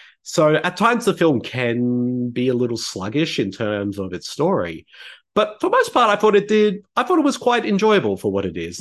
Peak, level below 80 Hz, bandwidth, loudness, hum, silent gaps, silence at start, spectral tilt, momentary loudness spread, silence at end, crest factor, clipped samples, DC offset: -2 dBFS; -54 dBFS; 12.5 kHz; -19 LUFS; none; none; 0.25 s; -5.5 dB/octave; 9 LU; 0 s; 16 dB; under 0.1%; under 0.1%